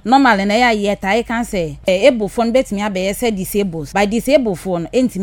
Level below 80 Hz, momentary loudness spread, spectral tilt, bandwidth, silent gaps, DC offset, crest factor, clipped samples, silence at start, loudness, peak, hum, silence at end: -40 dBFS; 7 LU; -5 dB/octave; 19.5 kHz; none; under 0.1%; 16 dB; under 0.1%; 0.05 s; -16 LUFS; 0 dBFS; none; 0 s